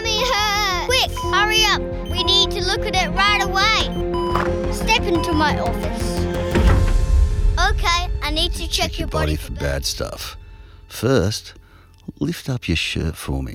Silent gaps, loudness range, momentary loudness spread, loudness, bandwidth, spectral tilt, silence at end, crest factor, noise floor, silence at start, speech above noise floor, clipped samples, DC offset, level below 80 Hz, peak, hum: none; 7 LU; 9 LU; -19 LUFS; 16.5 kHz; -4 dB/octave; 0 s; 16 dB; -40 dBFS; 0 s; 20 dB; under 0.1%; under 0.1%; -26 dBFS; -2 dBFS; none